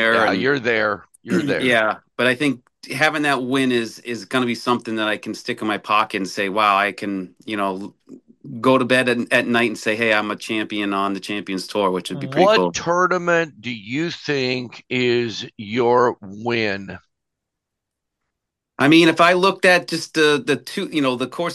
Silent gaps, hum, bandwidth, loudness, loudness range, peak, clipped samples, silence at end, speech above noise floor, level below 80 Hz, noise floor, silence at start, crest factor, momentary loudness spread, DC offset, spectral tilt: none; none; 12.5 kHz; -19 LUFS; 4 LU; -2 dBFS; under 0.1%; 0 s; 62 dB; -66 dBFS; -81 dBFS; 0 s; 18 dB; 11 LU; under 0.1%; -4.5 dB/octave